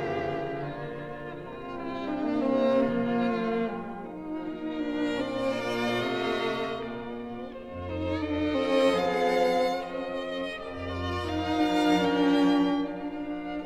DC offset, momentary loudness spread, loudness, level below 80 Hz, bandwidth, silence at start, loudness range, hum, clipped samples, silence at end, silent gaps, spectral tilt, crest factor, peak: 0.1%; 13 LU; -29 LUFS; -54 dBFS; 13 kHz; 0 s; 4 LU; none; under 0.1%; 0 s; none; -6 dB/octave; 16 dB; -12 dBFS